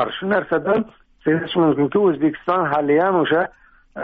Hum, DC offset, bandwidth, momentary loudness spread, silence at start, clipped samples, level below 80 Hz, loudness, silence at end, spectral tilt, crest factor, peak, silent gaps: none; under 0.1%; 4.8 kHz; 7 LU; 0 s; under 0.1%; -56 dBFS; -19 LUFS; 0 s; -4.5 dB/octave; 12 dB; -6 dBFS; none